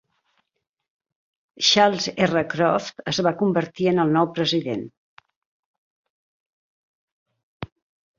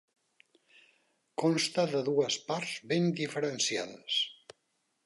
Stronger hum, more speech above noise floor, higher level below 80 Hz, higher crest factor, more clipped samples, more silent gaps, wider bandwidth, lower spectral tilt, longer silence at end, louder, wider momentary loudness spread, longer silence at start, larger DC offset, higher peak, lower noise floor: neither; first, 59 dB vs 47 dB; first, -62 dBFS vs -82 dBFS; about the same, 22 dB vs 18 dB; neither; first, 4.97-5.17 s, 5.36-6.04 s, 6.10-7.26 s, 7.43-7.60 s vs none; second, 7.6 kHz vs 11.5 kHz; about the same, -4.5 dB/octave vs -4 dB/octave; second, 0.55 s vs 0.75 s; first, -21 LUFS vs -31 LUFS; first, 22 LU vs 6 LU; first, 1.6 s vs 1.4 s; neither; first, -2 dBFS vs -16 dBFS; about the same, -80 dBFS vs -78 dBFS